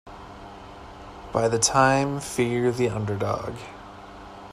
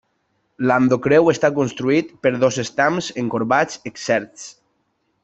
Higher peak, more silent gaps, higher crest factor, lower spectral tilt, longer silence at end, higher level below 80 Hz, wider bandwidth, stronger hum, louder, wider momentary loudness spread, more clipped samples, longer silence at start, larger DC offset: second, -6 dBFS vs -2 dBFS; neither; about the same, 20 dB vs 16 dB; about the same, -4.5 dB/octave vs -5.5 dB/octave; second, 0 s vs 0.75 s; first, -50 dBFS vs -58 dBFS; first, 14 kHz vs 8.2 kHz; neither; second, -23 LUFS vs -19 LUFS; first, 23 LU vs 10 LU; neither; second, 0.05 s vs 0.6 s; neither